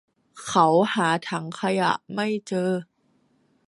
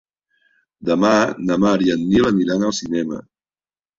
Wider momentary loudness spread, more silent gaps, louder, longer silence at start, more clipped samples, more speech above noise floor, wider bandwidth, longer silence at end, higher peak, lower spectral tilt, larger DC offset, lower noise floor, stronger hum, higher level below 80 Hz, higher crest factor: about the same, 10 LU vs 9 LU; neither; second, -24 LUFS vs -18 LUFS; second, 0.35 s vs 0.8 s; neither; second, 43 dB vs over 73 dB; first, 11.5 kHz vs 7.8 kHz; about the same, 0.85 s vs 0.75 s; second, -6 dBFS vs -2 dBFS; about the same, -5 dB/octave vs -5.5 dB/octave; neither; second, -65 dBFS vs under -90 dBFS; neither; second, -70 dBFS vs -50 dBFS; about the same, 20 dB vs 18 dB